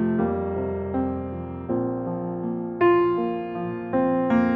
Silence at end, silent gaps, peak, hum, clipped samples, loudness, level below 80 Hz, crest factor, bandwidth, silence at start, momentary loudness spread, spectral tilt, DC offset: 0 s; none; -8 dBFS; none; under 0.1%; -25 LUFS; -50 dBFS; 16 dB; 4.6 kHz; 0 s; 10 LU; -10 dB/octave; under 0.1%